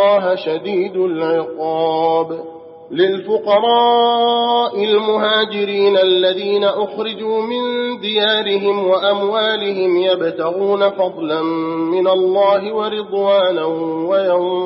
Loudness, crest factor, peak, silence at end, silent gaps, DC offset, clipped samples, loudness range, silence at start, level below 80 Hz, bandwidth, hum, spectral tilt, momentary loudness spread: -16 LUFS; 14 dB; -2 dBFS; 0 s; none; under 0.1%; under 0.1%; 3 LU; 0 s; -72 dBFS; 5.8 kHz; none; -2 dB/octave; 7 LU